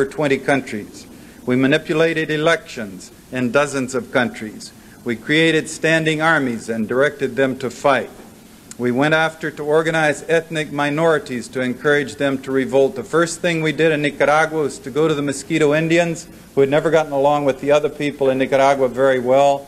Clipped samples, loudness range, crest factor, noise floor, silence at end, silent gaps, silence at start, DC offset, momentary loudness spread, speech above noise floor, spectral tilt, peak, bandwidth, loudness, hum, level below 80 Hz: under 0.1%; 3 LU; 16 dB; -41 dBFS; 0 s; none; 0 s; under 0.1%; 11 LU; 23 dB; -5 dB/octave; -2 dBFS; 15 kHz; -18 LUFS; none; -54 dBFS